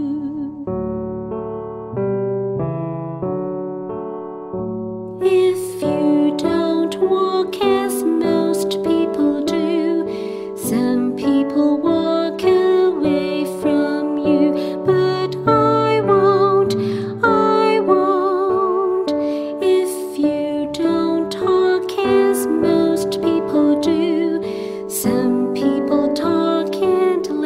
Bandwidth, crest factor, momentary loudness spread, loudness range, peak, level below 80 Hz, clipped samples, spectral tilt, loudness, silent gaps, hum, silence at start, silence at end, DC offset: 16 kHz; 16 dB; 10 LU; 7 LU; -2 dBFS; -52 dBFS; under 0.1%; -6 dB/octave; -18 LUFS; none; none; 0 s; 0 s; under 0.1%